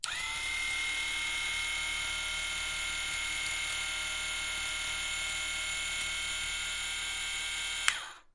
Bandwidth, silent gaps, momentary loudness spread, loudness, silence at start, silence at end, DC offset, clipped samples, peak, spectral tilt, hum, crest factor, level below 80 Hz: 11.5 kHz; none; 2 LU; -32 LUFS; 0.05 s; 0.05 s; under 0.1%; under 0.1%; -6 dBFS; 1 dB/octave; none; 30 dB; -54 dBFS